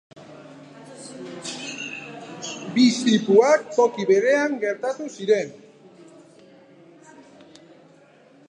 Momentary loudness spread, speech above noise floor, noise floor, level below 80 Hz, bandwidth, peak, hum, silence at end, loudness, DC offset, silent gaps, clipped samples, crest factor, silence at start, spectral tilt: 26 LU; 33 dB; -53 dBFS; -78 dBFS; 10.5 kHz; -4 dBFS; none; 2.95 s; -21 LUFS; under 0.1%; none; under 0.1%; 20 dB; 0.15 s; -4.5 dB/octave